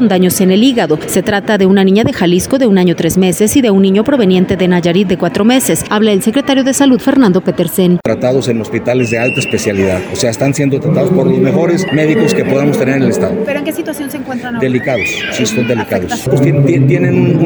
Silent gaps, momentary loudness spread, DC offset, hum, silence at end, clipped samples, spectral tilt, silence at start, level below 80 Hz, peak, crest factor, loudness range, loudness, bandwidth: none; 6 LU; under 0.1%; none; 0 s; under 0.1%; -5.5 dB/octave; 0 s; -42 dBFS; 0 dBFS; 10 dB; 4 LU; -11 LUFS; over 20 kHz